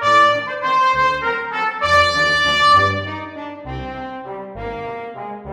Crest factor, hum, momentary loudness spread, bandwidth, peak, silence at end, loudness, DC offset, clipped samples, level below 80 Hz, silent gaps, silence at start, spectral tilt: 16 dB; none; 17 LU; 13.5 kHz; -2 dBFS; 0 s; -15 LUFS; under 0.1%; under 0.1%; -42 dBFS; none; 0 s; -3.5 dB/octave